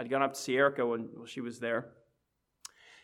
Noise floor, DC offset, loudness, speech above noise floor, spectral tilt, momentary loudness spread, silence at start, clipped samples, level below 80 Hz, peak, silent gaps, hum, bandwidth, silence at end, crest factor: -80 dBFS; under 0.1%; -32 LUFS; 48 dB; -4.5 dB/octave; 22 LU; 0 s; under 0.1%; -82 dBFS; -14 dBFS; none; none; 16 kHz; 1.15 s; 20 dB